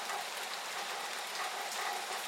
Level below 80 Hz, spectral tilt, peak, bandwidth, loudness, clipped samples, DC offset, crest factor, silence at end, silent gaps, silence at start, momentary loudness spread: under -90 dBFS; 1 dB/octave; -22 dBFS; 16.5 kHz; -38 LUFS; under 0.1%; under 0.1%; 16 dB; 0 s; none; 0 s; 2 LU